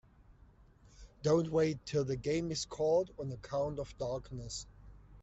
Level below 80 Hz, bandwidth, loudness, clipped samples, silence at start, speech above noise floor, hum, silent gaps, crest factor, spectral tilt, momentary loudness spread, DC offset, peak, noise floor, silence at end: -58 dBFS; 8.2 kHz; -35 LUFS; under 0.1%; 0.3 s; 27 dB; none; none; 18 dB; -5.5 dB/octave; 12 LU; under 0.1%; -18 dBFS; -62 dBFS; 0 s